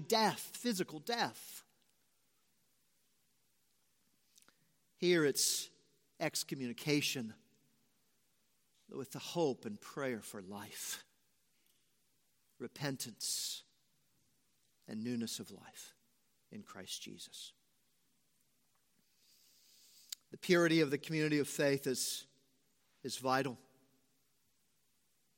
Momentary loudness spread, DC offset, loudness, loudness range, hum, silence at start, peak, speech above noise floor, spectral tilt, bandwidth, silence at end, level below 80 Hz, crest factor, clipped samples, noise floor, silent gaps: 20 LU; under 0.1%; -37 LUFS; 16 LU; none; 0 s; -16 dBFS; 41 dB; -3.5 dB/octave; 16.5 kHz; 1.8 s; -88 dBFS; 24 dB; under 0.1%; -79 dBFS; none